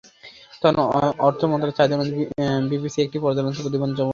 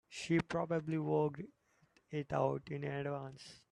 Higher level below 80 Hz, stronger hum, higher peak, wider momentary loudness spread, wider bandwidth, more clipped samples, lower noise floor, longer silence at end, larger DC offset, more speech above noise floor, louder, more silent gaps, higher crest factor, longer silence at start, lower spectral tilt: first, -56 dBFS vs -70 dBFS; neither; first, -2 dBFS vs -20 dBFS; second, 5 LU vs 15 LU; second, 7.4 kHz vs 11 kHz; neither; second, -46 dBFS vs -73 dBFS; second, 0 s vs 0.15 s; neither; second, 25 dB vs 35 dB; first, -21 LUFS vs -38 LUFS; neither; about the same, 20 dB vs 20 dB; first, 0.25 s vs 0.1 s; about the same, -7 dB/octave vs -7 dB/octave